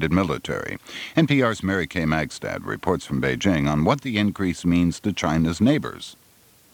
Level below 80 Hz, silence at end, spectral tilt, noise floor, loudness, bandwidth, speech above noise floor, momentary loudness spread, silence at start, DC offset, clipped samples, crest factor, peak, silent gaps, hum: -44 dBFS; 0.6 s; -6 dB/octave; -55 dBFS; -23 LUFS; 19.5 kHz; 33 dB; 10 LU; 0 s; under 0.1%; under 0.1%; 20 dB; -2 dBFS; none; none